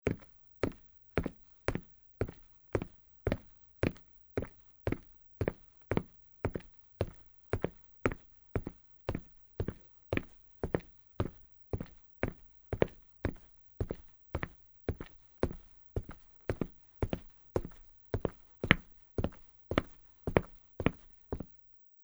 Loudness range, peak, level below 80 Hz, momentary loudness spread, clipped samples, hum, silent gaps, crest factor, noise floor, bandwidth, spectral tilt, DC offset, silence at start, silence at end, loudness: 6 LU; -2 dBFS; -50 dBFS; 19 LU; under 0.1%; none; none; 36 dB; -60 dBFS; over 20 kHz; -7 dB/octave; under 0.1%; 0.05 s; 0.55 s; -39 LUFS